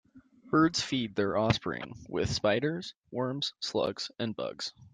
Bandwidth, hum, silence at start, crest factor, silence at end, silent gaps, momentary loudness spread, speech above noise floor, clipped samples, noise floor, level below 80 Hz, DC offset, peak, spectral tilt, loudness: 9.8 kHz; none; 0.15 s; 22 dB; 0.05 s; none; 11 LU; 26 dB; under 0.1%; -57 dBFS; -58 dBFS; under 0.1%; -10 dBFS; -5 dB/octave; -31 LUFS